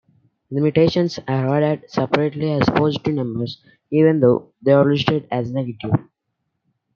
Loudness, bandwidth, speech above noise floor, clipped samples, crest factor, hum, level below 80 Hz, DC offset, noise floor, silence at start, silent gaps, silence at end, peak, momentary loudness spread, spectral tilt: -19 LUFS; 7 kHz; 57 dB; under 0.1%; 18 dB; none; -54 dBFS; under 0.1%; -75 dBFS; 0.5 s; none; 0.95 s; 0 dBFS; 10 LU; -8 dB/octave